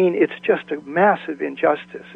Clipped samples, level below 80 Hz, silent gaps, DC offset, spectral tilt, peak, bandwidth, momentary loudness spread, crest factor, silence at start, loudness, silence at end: under 0.1%; -70 dBFS; none; under 0.1%; -8 dB/octave; -4 dBFS; 5.2 kHz; 8 LU; 16 dB; 0 s; -20 LUFS; 0 s